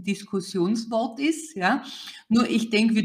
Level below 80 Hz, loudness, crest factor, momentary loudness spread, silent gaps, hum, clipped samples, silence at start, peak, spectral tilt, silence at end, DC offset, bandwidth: -66 dBFS; -25 LUFS; 16 dB; 8 LU; none; none; under 0.1%; 0 s; -8 dBFS; -5 dB/octave; 0 s; under 0.1%; 15 kHz